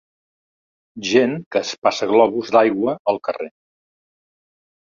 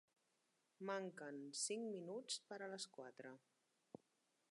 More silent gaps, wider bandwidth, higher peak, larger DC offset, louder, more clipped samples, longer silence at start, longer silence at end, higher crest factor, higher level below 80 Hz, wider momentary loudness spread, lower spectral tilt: first, 1.46-1.51 s, 1.78-1.82 s, 2.99-3.05 s vs none; second, 7.6 kHz vs 11.5 kHz; first, 0 dBFS vs -32 dBFS; neither; first, -18 LUFS vs -49 LUFS; neither; first, 0.95 s vs 0.8 s; first, 1.35 s vs 1.15 s; about the same, 20 dB vs 20 dB; first, -66 dBFS vs under -90 dBFS; second, 12 LU vs 20 LU; first, -4.5 dB/octave vs -2.5 dB/octave